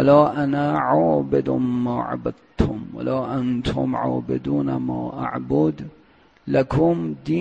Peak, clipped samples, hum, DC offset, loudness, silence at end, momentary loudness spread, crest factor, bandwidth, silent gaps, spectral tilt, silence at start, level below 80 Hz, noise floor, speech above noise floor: -2 dBFS; under 0.1%; none; under 0.1%; -22 LUFS; 0 s; 9 LU; 18 dB; 8.8 kHz; none; -9 dB/octave; 0 s; -42 dBFS; -54 dBFS; 33 dB